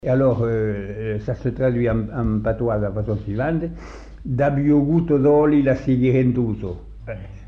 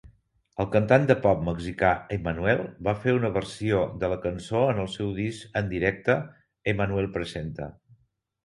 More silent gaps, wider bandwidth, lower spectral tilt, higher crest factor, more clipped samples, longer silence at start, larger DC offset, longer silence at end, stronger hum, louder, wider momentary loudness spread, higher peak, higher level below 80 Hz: neither; second, 6.6 kHz vs 11.5 kHz; first, -10.5 dB/octave vs -7 dB/octave; second, 12 dB vs 22 dB; neither; about the same, 0.05 s vs 0.05 s; neither; second, 0 s vs 0.75 s; neither; first, -20 LUFS vs -26 LUFS; first, 15 LU vs 11 LU; second, -8 dBFS vs -4 dBFS; first, -38 dBFS vs -46 dBFS